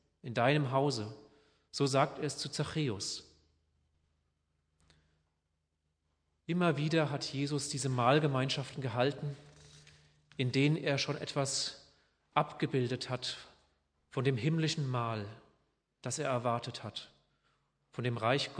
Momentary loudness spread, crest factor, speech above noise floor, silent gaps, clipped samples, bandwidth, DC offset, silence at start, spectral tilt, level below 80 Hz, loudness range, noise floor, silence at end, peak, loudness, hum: 13 LU; 24 dB; 49 dB; none; under 0.1%; 10.5 kHz; under 0.1%; 0.25 s; -5 dB/octave; -72 dBFS; 7 LU; -82 dBFS; 0 s; -12 dBFS; -34 LUFS; none